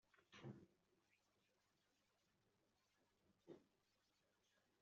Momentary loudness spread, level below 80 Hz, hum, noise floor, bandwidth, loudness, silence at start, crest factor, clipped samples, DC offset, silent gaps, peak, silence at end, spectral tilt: 7 LU; under -90 dBFS; none; -86 dBFS; 7 kHz; -64 LUFS; 0.05 s; 24 dB; under 0.1%; under 0.1%; none; -46 dBFS; 0.05 s; -5.5 dB/octave